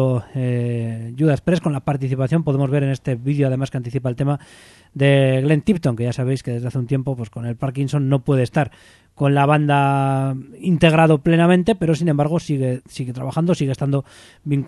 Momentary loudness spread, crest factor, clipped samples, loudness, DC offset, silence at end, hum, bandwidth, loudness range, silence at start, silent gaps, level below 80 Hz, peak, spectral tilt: 10 LU; 18 dB; under 0.1%; -19 LUFS; under 0.1%; 0 s; none; 11.5 kHz; 4 LU; 0 s; none; -48 dBFS; 0 dBFS; -7.5 dB/octave